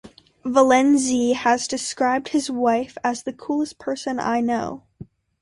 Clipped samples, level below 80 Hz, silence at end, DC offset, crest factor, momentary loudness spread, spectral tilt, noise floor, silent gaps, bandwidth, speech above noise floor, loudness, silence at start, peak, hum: under 0.1%; -60 dBFS; 0.4 s; under 0.1%; 18 dB; 11 LU; -3.5 dB/octave; -44 dBFS; none; 11.5 kHz; 23 dB; -21 LUFS; 0.05 s; -4 dBFS; none